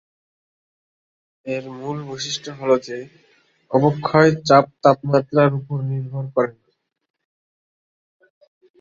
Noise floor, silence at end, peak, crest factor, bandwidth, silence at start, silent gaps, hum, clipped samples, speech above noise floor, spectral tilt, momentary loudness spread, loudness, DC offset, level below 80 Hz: under -90 dBFS; 2.3 s; -2 dBFS; 20 dB; 7.6 kHz; 1.45 s; none; none; under 0.1%; over 71 dB; -6 dB/octave; 13 LU; -19 LUFS; under 0.1%; -60 dBFS